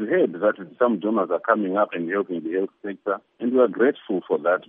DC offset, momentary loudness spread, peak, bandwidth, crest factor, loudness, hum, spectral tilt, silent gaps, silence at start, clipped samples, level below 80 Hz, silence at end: under 0.1%; 8 LU; -4 dBFS; 3.8 kHz; 18 dB; -23 LUFS; none; -10.5 dB/octave; none; 0 s; under 0.1%; -80 dBFS; 0.05 s